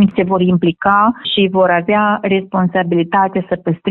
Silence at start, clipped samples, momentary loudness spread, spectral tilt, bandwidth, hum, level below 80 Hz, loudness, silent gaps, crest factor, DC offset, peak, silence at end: 0 s; under 0.1%; 4 LU; -10 dB/octave; 4.2 kHz; none; -50 dBFS; -14 LUFS; none; 12 dB; under 0.1%; 0 dBFS; 0 s